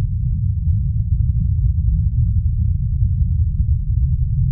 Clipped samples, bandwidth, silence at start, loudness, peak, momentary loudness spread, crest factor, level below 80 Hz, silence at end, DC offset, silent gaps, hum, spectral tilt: under 0.1%; 0.3 kHz; 0 s; -19 LUFS; -6 dBFS; 2 LU; 10 dB; -20 dBFS; 0 s; under 0.1%; none; none; -20 dB/octave